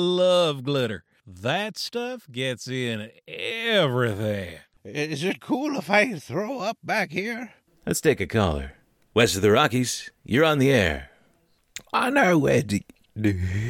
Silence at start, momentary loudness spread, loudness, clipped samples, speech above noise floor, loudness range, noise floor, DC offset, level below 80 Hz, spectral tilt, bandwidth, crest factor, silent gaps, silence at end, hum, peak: 0 s; 15 LU; -24 LUFS; under 0.1%; 41 dB; 5 LU; -65 dBFS; under 0.1%; -48 dBFS; -5 dB/octave; 17 kHz; 18 dB; none; 0 s; none; -6 dBFS